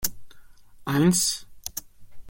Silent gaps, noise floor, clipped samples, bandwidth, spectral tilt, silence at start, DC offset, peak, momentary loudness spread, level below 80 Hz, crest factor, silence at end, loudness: none; -46 dBFS; under 0.1%; 17 kHz; -4 dB/octave; 0 s; under 0.1%; -6 dBFS; 17 LU; -52 dBFS; 22 dB; 0 s; -24 LUFS